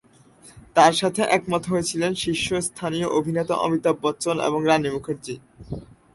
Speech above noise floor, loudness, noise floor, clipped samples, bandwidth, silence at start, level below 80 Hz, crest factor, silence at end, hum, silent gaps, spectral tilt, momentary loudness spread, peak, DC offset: 29 dB; -22 LUFS; -51 dBFS; under 0.1%; 12 kHz; 0.45 s; -54 dBFS; 20 dB; 0.3 s; none; none; -4.5 dB/octave; 17 LU; -4 dBFS; under 0.1%